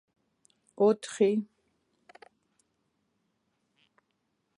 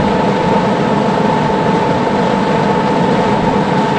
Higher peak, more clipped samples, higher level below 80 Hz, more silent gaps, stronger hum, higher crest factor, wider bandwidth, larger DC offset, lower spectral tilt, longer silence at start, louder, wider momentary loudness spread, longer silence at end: second, -12 dBFS vs 0 dBFS; neither; second, -84 dBFS vs -38 dBFS; neither; neither; first, 22 dB vs 12 dB; first, 11 kHz vs 9.8 kHz; neither; about the same, -6 dB/octave vs -7 dB/octave; first, 0.8 s vs 0 s; second, -27 LUFS vs -13 LUFS; first, 9 LU vs 1 LU; first, 3.15 s vs 0 s